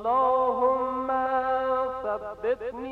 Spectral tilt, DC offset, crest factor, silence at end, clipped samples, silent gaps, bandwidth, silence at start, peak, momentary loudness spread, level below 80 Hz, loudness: -6.5 dB/octave; under 0.1%; 14 dB; 0 s; under 0.1%; none; 4.6 kHz; 0 s; -12 dBFS; 8 LU; -56 dBFS; -26 LUFS